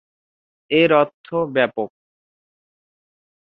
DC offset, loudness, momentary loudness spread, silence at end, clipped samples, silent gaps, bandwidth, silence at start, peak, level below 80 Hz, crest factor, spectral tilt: under 0.1%; -19 LUFS; 12 LU; 1.55 s; under 0.1%; 1.14-1.24 s; 4.9 kHz; 0.7 s; -2 dBFS; -64 dBFS; 20 dB; -8.5 dB/octave